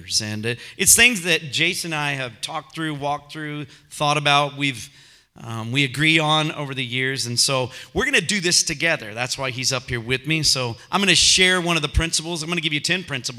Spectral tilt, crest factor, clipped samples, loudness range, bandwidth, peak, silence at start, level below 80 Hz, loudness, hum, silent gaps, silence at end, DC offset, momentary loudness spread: -2.5 dB/octave; 22 dB; under 0.1%; 5 LU; 16 kHz; 0 dBFS; 0 s; -40 dBFS; -19 LUFS; none; none; 0 s; under 0.1%; 14 LU